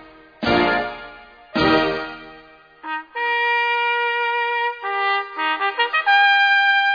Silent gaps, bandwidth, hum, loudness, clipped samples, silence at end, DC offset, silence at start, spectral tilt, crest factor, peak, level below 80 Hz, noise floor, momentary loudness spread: none; 5.2 kHz; none; -18 LUFS; under 0.1%; 0 s; under 0.1%; 0 s; -5 dB/octave; 16 dB; -4 dBFS; -50 dBFS; -46 dBFS; 16 LU